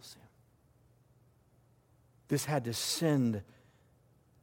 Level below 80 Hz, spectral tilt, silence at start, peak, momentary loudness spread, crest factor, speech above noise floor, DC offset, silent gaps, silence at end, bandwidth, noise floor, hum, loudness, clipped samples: -72 dBFS; -5 dB/octave; 0.05 s; -18 dBFS; 17 LU; 20 dB; 35 dB; under 0.1%; none; 1 s; 17 kHz; -67 dBFS; none; -33 LUFS; under 0.1%